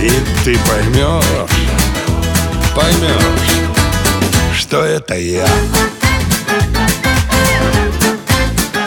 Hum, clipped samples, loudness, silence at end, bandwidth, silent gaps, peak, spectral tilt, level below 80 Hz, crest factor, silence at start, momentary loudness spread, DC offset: none; under 0.1%; -13 LUFS; 0 s; over 20 kHz; none; 0 dBFS; -4 dB/octave; -20 dBFS; 12 dB; 0 s; 3 LU; under 0.1%